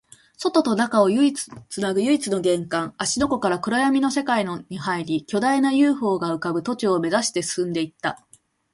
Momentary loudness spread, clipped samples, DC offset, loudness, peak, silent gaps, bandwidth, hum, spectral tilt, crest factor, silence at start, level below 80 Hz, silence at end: 9 LU; under 0.1%; under 0.1%; -22 LUFS; -4 dBFS; none; 11.5 kHz; none; -4.5 dB/octave; 18 dB; 0.4 s; -58 dBFS; 0.55 s